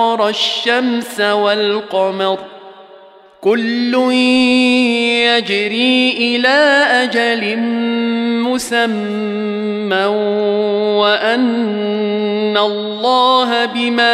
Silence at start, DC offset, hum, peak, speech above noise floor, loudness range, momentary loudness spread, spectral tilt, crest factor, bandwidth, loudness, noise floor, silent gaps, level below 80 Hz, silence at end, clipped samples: 0 s; under 0.1%; none; -2 dBFS; 27 dB; 5 LU; 7 LU; -4 dB/octave; 12 dB; 13.5 kHz; -14 LUFS; -42 dBFS; none; -64 dBFS; 0 s; under 0.1%